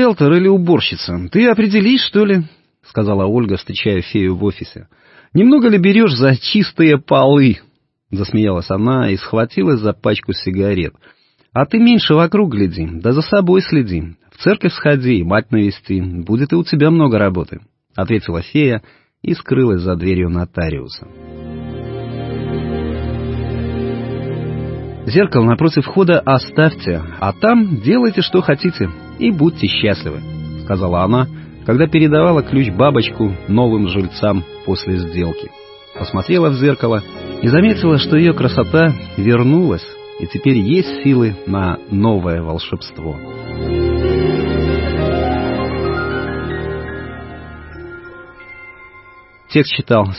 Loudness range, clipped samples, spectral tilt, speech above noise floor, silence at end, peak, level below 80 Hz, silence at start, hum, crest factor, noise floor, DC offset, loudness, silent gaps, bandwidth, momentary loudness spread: 7 LU; under 0.1%; -11 dB/octave; 29 dB; 0 s; 0 dBFS; -34 dBFS; 0 s; none; 14 dB; -43 dBFS; under 0.1%; -15 LUFS; none; 5.8 kHz; 15 LU